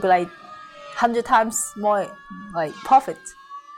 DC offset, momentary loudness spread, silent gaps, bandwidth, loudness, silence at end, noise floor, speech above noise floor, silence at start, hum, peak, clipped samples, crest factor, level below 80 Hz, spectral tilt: under 0.1%; 21 LU; none; 16.5 kHz; -21 LUFS; 0 s; -40 dBFS; 19 dB; 0 s; none; -6 dBFS; under 0.1%; 16 dB; -58 dBFS; -3.5 dB/octave